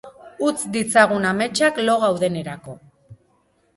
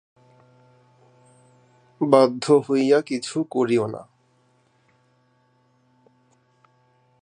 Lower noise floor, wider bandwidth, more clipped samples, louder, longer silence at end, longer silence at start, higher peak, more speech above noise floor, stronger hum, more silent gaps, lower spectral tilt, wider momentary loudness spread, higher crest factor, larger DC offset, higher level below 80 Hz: about the same, -63 dBFS vs -63 dBFS; first, 11.5 kHz vs 10 kHz; neither; about the same, -19 LUFS vs -20 LUFS; second, 0.6 s vs 3.2 s; second, 0.05 s vs 2 s; about the same, -2 dBFS vs -2 dBFS; about the same, 43 dB vs 44 dB; neither; neither; second, -4 dB/octave vs -6 dB/octave; first, 15 LU vs 11 LU; about the same, 20 dB vs 24 dB; neither; first, -60 dBFS vs -74 dBFS